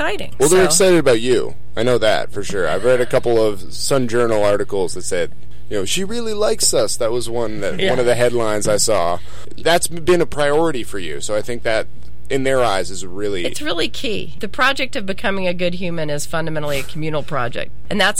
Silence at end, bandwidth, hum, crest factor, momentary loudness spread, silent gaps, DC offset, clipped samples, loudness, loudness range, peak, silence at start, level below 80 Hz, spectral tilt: 0 s; 16.5 kHz; none; 16 dB; 9 LU; none; 10%; under 0.1%; -18 LUFS; 4 LU; 0 dBFS; 0 s; -42 dBFS; -3.5 dB/octave